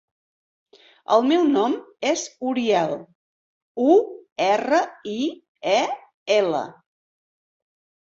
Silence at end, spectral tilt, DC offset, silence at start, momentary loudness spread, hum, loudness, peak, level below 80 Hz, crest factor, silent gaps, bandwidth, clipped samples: 1.3 s; -4 dB/octave; under 0.1%; 1.1 s; 14 LU; none; -22 LUFS; -4 dBFS; -70 dBFS; 18 dB; 3.15-3.75 s, 4.32-4.36 s, 5.48-5.55 s, 6.14-6.26 s; 8 kHz; under 0.1%